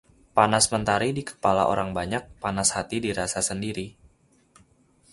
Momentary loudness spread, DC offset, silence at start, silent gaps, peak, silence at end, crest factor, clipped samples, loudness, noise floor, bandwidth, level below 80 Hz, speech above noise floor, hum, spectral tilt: 10 LU; under 0.1%; 0.35 s; none; -4 dBFS; 1.25 s; 22 dB; under 0.1%; -24 LUFS; -61 dBFS; 11.5 kHz; -50 dBFS; 36 dB; none; -3.5 dB/octave